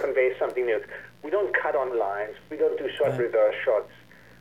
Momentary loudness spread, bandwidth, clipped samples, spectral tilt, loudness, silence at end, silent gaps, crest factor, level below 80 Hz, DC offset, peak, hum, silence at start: 10 LU; 13 kHz; under 0.1%; -6.5 dB/octave; -26 LUFS; 0.55 s; none; 16 dB; -66 dBFS; 0.1%; -10 dBFS; none; 0 s